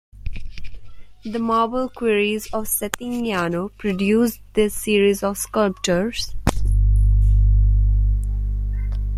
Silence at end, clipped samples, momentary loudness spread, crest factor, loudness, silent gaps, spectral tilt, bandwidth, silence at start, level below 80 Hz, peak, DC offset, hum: 0 s; under 0.1%; 8 LU; 20 dB; -21 LUFS; none; -5.5 dB/octave; 15 kHz; 0.15 s; -22 dBFS; 0 dBFS; under 0.1%; 50 Hz at -35 dBFS